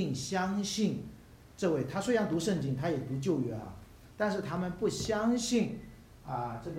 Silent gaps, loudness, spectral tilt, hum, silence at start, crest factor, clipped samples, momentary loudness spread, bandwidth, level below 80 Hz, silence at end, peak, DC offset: none; -33 LUFS; -5.5 dB/octave; none; 0 s; 16 dB; under 0.1%; 13 LU; 16 kHz; -58 dBFS; 0 s; -16 dBFS; under 0.1%